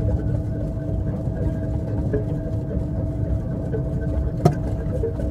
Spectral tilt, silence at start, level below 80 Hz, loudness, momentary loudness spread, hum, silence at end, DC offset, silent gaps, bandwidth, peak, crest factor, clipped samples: -9.5 dB/octave; 0 s; -30 dBFS; -25 LUFS; 5 LU; none; 0 s; under 0.1%; none; 10.5 kHz; 0 dBFS; 22 dB; under 0.1%